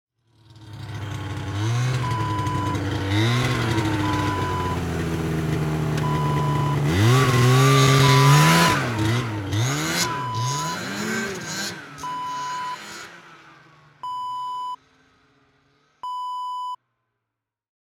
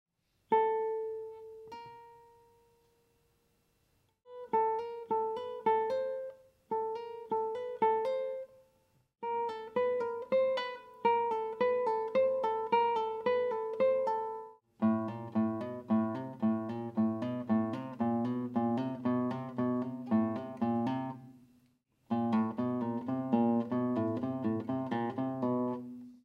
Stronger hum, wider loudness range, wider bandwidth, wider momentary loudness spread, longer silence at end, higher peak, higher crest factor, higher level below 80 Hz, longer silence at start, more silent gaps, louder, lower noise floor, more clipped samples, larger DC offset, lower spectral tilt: neither; first, 16 LU vs 6 LU; first, 18 kHz vs 6.4 kHz; first, 18 LU vs 11 LU; first, 1.2 s vs 0.1 s; first, -4 dBFS vs -16 dBFS; about the same, 20 dB vs 18 dB; first, -46 dBFS vs -80 dBFS; about the same, 0.6 s vs 0.5 s; neither; first, -22 LUFS vs -33 LUFS; first, -84 dBFS vs -74 dBFS; neither; neither; second, -5 dB/octave vs -8.5 dB/octave